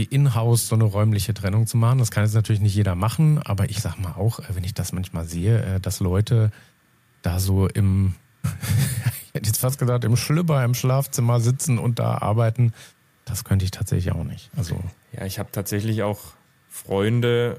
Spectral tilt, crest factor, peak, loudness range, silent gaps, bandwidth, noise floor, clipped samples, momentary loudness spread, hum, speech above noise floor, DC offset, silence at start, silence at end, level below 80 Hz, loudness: -6 dB/octave; 12 dB; -10 dBFS; 6 LU; none; 15.5 kHz; -60 dBFS; under 0.1%; 10 LU; none; 39 dB; under 0.1%; 0 s; 0 s; -46 dBFS; -22 LUFS